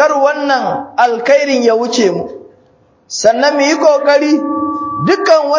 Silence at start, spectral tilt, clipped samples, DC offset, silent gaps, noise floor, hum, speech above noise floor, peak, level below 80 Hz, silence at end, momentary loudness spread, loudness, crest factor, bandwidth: 0 s; -4 dB/octave; 0.1%; under 0.1%; none; -50 dBFS; none; 39 dB; 0 dBFS; -56 dBFS; 0 s; 7 LU; -12 LUFS; 12 dB; 7.6 kHz